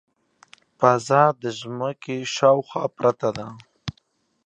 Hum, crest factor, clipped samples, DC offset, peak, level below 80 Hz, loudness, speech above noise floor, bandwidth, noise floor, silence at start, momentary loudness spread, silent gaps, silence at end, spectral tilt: none; 22 dB; under 0.1%; under 0.1%; -2 dBFS; -60 dBFS; -21 LUFS; 45 dB; 9.4 kHz; -66 dBFS; 0.8 s; 18 LU; none; 0.55 s; -5 dB/octave